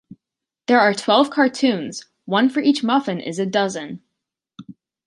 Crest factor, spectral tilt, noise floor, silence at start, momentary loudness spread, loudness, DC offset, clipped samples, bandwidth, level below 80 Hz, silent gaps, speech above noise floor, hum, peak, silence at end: 18 dB; -4.5 dB/octave; -86 dBFS; 0.7 s; 16 LU; -19 LUFS; under 0.1%; under 0.1%; 11.5 kHz; -70 dBFS; none; 67 dB; none; -2 dBFS; 0.35 s